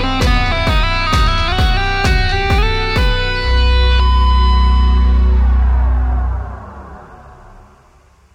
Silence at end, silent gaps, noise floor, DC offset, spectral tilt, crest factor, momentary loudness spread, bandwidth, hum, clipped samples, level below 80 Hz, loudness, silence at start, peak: 1.2 s; none; -48 dBFS; under 0.1%; -5.5 dB/octave; 12 dB; 7 LU; 9.2 kHz; none; under 0.1%; -14 dBFS; -14 LUFS; 0 s; -2 dBFS